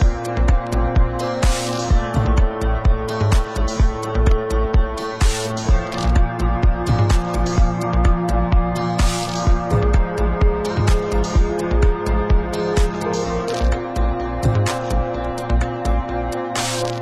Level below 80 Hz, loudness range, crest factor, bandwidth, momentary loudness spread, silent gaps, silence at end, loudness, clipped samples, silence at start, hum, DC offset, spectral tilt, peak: -20 dBFS; 2 LU; 14 dB; 12.5 kHz; 4 LU; none; 0 s; -20 LUFS; under 0.1%; 0 s; none; under 0.1%; -6 dB/octave; -4 dBFS